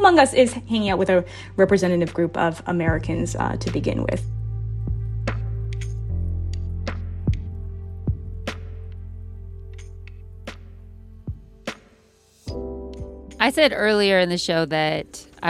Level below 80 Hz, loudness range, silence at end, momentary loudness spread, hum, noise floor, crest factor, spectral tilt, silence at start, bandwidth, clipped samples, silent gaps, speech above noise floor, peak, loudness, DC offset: -36 dBFS; 16 LU; 0 s; 21 LU; none; -56 dBFS; 22 dB; -5.5 dB/octave; 0 s; 14 kHz; under 0.1%; none; 36 dB; -2 dBFS; -22 LUFS; under 0.1%